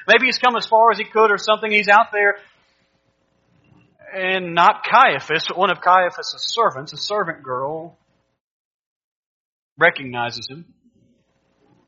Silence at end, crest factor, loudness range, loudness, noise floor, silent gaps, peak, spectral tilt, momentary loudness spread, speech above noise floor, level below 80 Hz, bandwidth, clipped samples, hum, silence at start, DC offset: 1.25 s; 20 dB; 8 LU; -17 LUFS; -65 dBFS; 8.40-9.76 s; 0 dBFS; -0.5 dB/octave; 13 LU; 47 dB; -70 dBFS; 7.6 kHz; under 0.1%; none; 0 s; under 0.1%